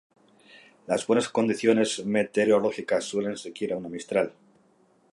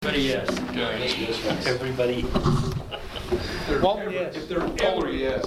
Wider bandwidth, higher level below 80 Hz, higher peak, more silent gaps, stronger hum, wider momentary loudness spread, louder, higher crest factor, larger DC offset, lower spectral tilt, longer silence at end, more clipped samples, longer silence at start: second, 11.5 kHz vs 16 kHz; second, -70 dBFS vs -38 dBFS; about the same, -6 dBFS vs -8 dBFS; neither; neither; first, 10 LU vs 6 LU; about the same, -26 LUFS vs -26 LUFS; about the same, 20 dB vs 18 dB; neither; about the same, -4.5 dB/octave vs -5.5 dB/octave; first, 0.8 s vs 0 s; neither; first, 0.55 s vs 0 s